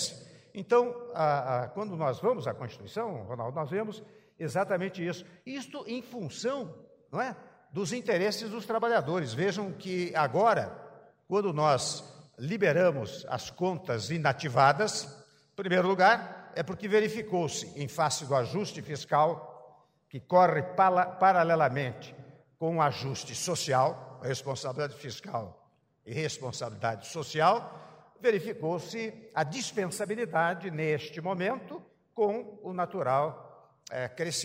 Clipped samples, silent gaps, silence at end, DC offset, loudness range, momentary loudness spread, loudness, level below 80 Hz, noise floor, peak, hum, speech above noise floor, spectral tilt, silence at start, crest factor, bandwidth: under 0.1%; none; 0 s; under 0.1%; 8 LU; 15 LU; -30 LUFS; -72 dBFS; -58 dBFS; -8 dBFS; none; 29 dB; -4.5 dB/octave; 0 s; 22 dB; 16 kHz